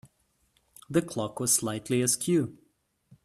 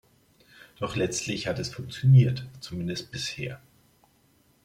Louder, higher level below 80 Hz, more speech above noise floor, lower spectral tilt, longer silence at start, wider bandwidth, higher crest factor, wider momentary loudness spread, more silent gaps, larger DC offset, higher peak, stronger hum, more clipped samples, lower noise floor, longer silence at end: about the same, -27 LUFS vs -27 LUFS; second, -66 dBFS vs -58 dBFS; first, 43 dB vs 38 dB; second, -4 dB/octave vs -5.5 dB/octave; about the same, 0.9 s vs 0.8 s; first, 15.5 kHz vs 11.5 kHz; about the same, 20 dB vs 20 dB; second, 6 LU vs 17 LU; neither; neither; about the same, -10 dBFS vs -8 dBFS; neither; neither; first, -71 dBFS vs -64 dBFS; second, 0.7 s vs 1.05 s